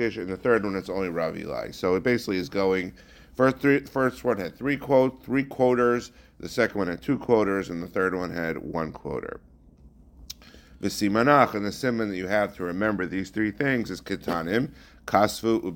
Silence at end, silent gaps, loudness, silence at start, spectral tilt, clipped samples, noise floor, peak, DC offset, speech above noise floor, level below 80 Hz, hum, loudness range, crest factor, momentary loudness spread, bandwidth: 0 s; none; -26 LUFS; 0 s; -6 dB/octave; under 0.1%; -52 dBFS; -4 dBFS; under 0.1%; 27 dB; -54 dBFS; none; 4 LU; 22 dB; 12 LU; 17 kHz